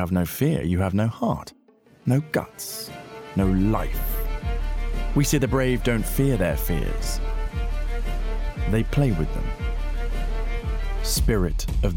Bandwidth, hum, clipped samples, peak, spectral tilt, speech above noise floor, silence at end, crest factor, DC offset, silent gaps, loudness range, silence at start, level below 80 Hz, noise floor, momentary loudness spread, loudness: 18 kHz; none; under 0.1%; -10 dBFS; -6 dB/octave; 28 dB; 0 s; 14 dB; under 0.1%; none; 3 LU; 0 s; -26 dBFS; -50 dBFS; 9 LU; -25 LUFS